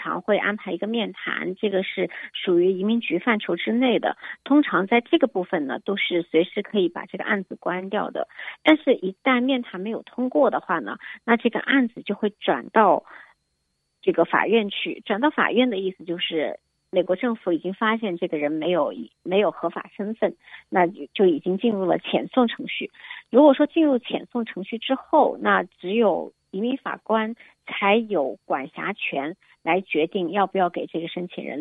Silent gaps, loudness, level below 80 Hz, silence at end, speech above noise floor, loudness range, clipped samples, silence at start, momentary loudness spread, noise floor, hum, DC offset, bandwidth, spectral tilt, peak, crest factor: none; -23 LUFS; -74 dBFS; 0 s; 51 dB; 4 LU; under 0.1%; 0 s; 10 LU; -74 dBFS; none; under 0.1%; 4.1 kHz; -8 dB/octave; -2 dBFS; 22 dB